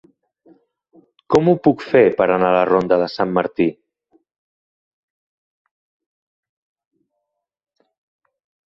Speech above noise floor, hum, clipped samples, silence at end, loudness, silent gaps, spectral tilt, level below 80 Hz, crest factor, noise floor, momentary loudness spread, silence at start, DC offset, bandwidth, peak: 62 dB; none; under 0.1%; 4.95 s; -16 LUFS; none; -7.5 dB/octave; -56 dBFS; 20 dB; -77 dBFS; 6 LU; 1.3 s; under 0.1%; 7.6 kHz; -2 dBFS